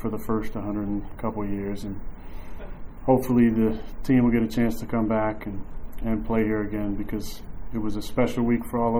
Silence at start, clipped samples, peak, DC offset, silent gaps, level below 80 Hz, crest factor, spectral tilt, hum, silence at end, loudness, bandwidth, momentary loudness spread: 0 s; under 0.1%; -6 dBFS; under 0.1%; none; -36 dBFS; 20 dB; -7.5 dB/octave; none; 0 s; -26 LUFS; over 20 kHz; 20 LU